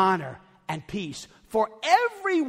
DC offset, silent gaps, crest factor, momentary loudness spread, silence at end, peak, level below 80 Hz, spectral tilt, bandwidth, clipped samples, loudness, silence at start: under 0.1%; none; 20 dB; 18 LU; 0 s; -6 dBFS; -62 dBFS; -4.5 dB/octave; 16 kHz; under 0.1%; -26 LUFS; 0 s